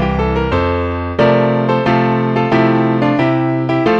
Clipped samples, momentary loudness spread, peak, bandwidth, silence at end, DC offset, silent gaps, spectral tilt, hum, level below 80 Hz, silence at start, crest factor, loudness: under 0.1%; 4 LU; 0 dBFS; 6.8 kHz; 0 s; 0.1%; none; -8.5 dB/octave; none; -30 dBFS; 0 s; 14 dB; -14 LUFS